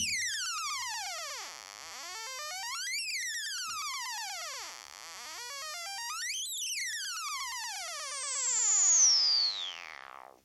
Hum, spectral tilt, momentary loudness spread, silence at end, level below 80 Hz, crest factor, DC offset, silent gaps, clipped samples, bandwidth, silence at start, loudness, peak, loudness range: none; 3.5 dB/octave; 19 LU; 0.25 s; -76 dBFS; 18 dB; under 0.1%; none; under 0.1%; 16.5 kHz; 0 s; -30 LUFS; -16 dBFS; 10 LU